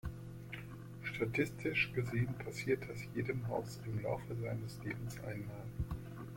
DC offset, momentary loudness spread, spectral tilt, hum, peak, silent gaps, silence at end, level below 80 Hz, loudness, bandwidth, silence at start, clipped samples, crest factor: under 0.1%; 12 LU; -6.5 dB/octave; none; -20 dBFS; none; 0 s; -56 dBFS; -40 LUFS; 16.5 kHz; 0.05 s; under 0.1%; 20 dB